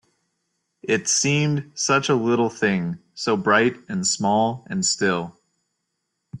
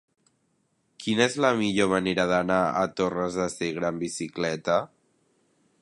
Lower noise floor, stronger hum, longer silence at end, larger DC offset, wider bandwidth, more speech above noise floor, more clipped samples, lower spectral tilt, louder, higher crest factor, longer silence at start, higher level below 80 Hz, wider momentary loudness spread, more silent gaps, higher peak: first, -77 dBFS vs -71 dBFS; neither; second, 0.05 s vs 0.95 s; neither; about the same, 11.5 kHz vs 11.5 kHz; first, 56 dB vs 46 dB; neither; about the same, -3.5 dB/octave vs -4.5 dB/octave; first, -21 LUFS vs -26 LUFS; about the same, 18 dB vs 20 dB; second, 0.85 s vs 1 s; about the same, -62 dBFS vs -60 dBFS; about the same, 8 LU vs 7 LU; neither; about the same, -6 dBFS vs -8 dBFS